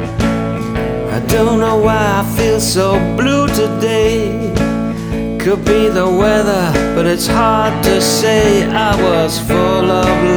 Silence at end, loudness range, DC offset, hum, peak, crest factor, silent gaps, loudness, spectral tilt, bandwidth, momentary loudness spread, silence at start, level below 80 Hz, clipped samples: 0 s; 2 LU; under 0.1%; none; 0 dBFS; 12 dB; none; -13 LUFS; -5 dB/octave; over 20 kHz; 6 LU; 0 s; -28 dBFS; under 0.1%